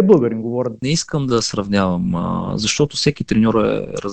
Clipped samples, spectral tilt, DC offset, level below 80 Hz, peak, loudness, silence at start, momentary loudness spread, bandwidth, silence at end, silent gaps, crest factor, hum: under 0.1%; -5 dB/octave; 0.4%; -42 dBFS; 0 dBFS; -18 LUFS; 0 s; 7 LU; 9.2 kHz; 0 s; none; 18 dB; none